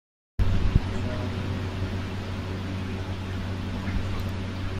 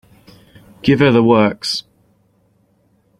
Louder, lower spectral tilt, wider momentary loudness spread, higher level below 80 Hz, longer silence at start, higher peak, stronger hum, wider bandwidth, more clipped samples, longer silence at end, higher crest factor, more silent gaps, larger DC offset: second, -30 LUFS vs -14 LUFS; about the same, -7 dB/octave vs -6 dB/octave; second, 6 LU vs 10 LU; first, -34 dBFS vs -50 dBFS; second, 0.4 s vs 0.85 s; second, -6 dBFS vs -2 dBFS; neither; second, 10.5 kHz vs 13 kHz; neither; second, 0 s vs 1.4 s; first, 22 dB vs 16 dB; neither; neither